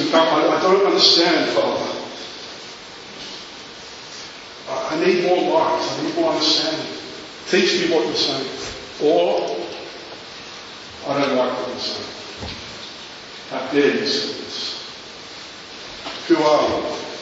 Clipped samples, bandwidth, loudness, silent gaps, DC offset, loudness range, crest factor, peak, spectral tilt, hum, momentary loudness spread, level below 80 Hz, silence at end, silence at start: under 0.1%; 8 kHz; -19 LUFS; none; under 0.1%; 7 LU; 20 dB; 0 dBFS; -3.5 dB/octave; none; 18 LU; -56 dBFS; 0 s; 0 s